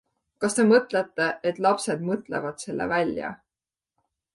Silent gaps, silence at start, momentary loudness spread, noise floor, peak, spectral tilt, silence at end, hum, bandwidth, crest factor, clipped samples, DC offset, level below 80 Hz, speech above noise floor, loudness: none; 0.4 s; 12 LU; under -90 dBFS; -6 dBFS; -4.5 dB/octave; 1 s; none; 11.5 kHz; 20 dB; under 0.1%; under 0.1%; -64 dBFS; over 66 dB; -25 LUFS